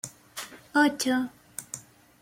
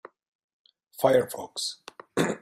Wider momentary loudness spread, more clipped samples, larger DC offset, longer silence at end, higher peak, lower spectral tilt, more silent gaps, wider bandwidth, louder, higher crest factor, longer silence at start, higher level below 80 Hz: about the same, 17 LU vs 17 LU; neither; neither; first, 0.4 s vs 0.05 s; about the same, -10 dBFS vs -8 dBFS; second, -2.5 dB/octave vs -4 dB/octave; neither; about the same, 16.5 kHz vs 16 kHz; about the same, -27 LUFS vs -27 LUFS; about the same, 20 dB vs 22 dB; second, 0.05 s vs 1 s; about the same, -70 dBFS vs -68 dBFS